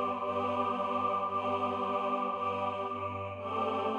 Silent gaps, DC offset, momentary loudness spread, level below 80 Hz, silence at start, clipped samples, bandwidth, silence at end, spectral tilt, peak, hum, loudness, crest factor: none; under 0.1%; 5 LU; -80 dBFS; 0 s; under 0.1%; 9.8 kHz; 0 s; -6.5 dB/octave; -20 dBFS; none; -33 LUFS; 14 dB